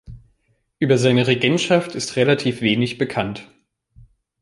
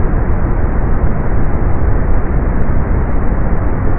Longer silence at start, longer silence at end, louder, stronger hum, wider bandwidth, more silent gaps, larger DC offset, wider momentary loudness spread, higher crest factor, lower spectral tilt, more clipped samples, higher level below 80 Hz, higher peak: about the same, 0.1 s vs 0 s; first, 0.95 s vs 0 s; about the same, -19 LUFS vs -17 LUFS; neither; first, 11.5 kHz vs 2.7 kHz; neither; neither; first, 9 LU vs 1 LU; first, 18 dB vs 10 dB; second, -5.5 dB/octave vs -15 dB/octave; neither; second, -52 dBFS vs -14 dBFS; about the same, -2 dBFS vs 0 dBFS